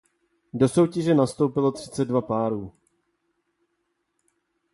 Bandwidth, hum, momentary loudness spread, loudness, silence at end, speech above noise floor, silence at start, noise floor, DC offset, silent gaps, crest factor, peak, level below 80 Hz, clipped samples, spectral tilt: 11.5 kHz; none; 11 LU; -23 LUFS; 2.05 s; 53 dB; 0.55 s; -75 dBFS; under 0.1%; none; 18 dB; -8 dBFS; -60 dBFS; under 0.1%; -7 dB/octave